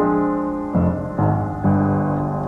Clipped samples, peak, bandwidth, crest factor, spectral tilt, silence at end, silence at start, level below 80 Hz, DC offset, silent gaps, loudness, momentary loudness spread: under 0.1%; -8 dBFS; 3.2 kHz; 12 dB; -11 dB/octave; 0 s; 0 s; -40 dBFS; under 0.1%; none; -20 LUFS; 3 LU